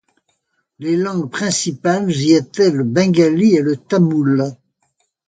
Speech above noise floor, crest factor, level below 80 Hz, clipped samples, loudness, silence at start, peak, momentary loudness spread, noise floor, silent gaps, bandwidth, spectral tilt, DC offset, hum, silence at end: 52 dB; 16 dB; -60 dBFS; under 0.1%; -16 LUFS; 0.8 s; 0 dBFS; 7 LU; -67 dBFS; none; 9.4 kHz; -5.5 dB/octave; under 0.1%; none; 0.75 s